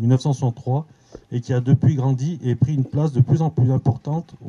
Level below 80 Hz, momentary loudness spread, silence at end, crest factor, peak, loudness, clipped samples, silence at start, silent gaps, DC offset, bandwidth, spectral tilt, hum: -52 dBFS; 9 LU; 0 s; 16 dB; -4 dBFS; -20 LUFS; under 0.1%; 0 s; none; under 0.1%; 7.2 kHz; -9 dB/octave; none